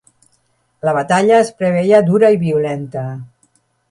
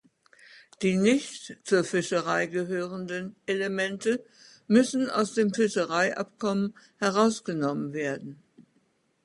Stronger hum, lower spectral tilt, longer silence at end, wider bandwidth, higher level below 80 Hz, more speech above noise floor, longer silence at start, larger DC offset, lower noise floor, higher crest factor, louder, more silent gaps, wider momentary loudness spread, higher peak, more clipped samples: neither; first, -6.5 dB/octave vs -5 dB/octave; about the same, 0.65 s vs 0.65 s; about the same, 11.5 kHz vs 11.5 kHz; first, -58 dBFS vs -72 dBFS; first, 48 dB vs 42 dB; first, 0.85 s vs 0.55 s; neither; second, -61 dBFS vs -69 dBFS; second, 14 dB vs 20 dB; first, -14 LUFS vs -27 LUFS; neither; first, 13 LU vs 10 LU; first, 0 dBFS vs -8 dBFS; neither